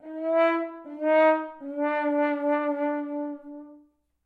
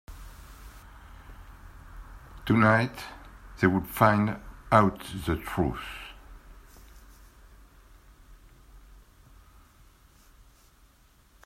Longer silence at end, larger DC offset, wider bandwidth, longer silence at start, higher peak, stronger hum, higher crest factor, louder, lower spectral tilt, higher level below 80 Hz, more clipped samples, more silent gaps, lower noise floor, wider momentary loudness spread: second, 0.5 s vs 3.1 s; neither; second, 4.7 kHz vs 16 kHz; about the same, 0.05 s vs 0.1 s; second, -10 dBFS vs -4 dBFS; neither; second, 16 dB vs 26 dB; about the same, -26 LUFS vs -26 LUFS; second, -5 dB/octave vs -7 dB/octave; second, -78 dBFS vs -48 dBFS; neither; neither; about the same, -59 dBFS vs -60 dBFS; second, 15 LU vs 27 LU